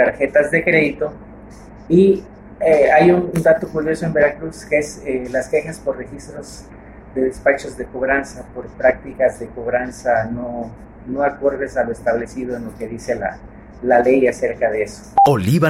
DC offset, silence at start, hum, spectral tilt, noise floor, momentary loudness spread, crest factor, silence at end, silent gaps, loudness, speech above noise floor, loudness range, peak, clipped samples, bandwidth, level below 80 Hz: under 0.1%; 0 s; none; -6.5 dB/octave; -38 dBFS; 16 LU; 16 dB; 0 s; none; -18 LUFS; 21 dB; 7 LU; -2 dBFS; under 0.1%; 15.5 kHz; -42 dBFS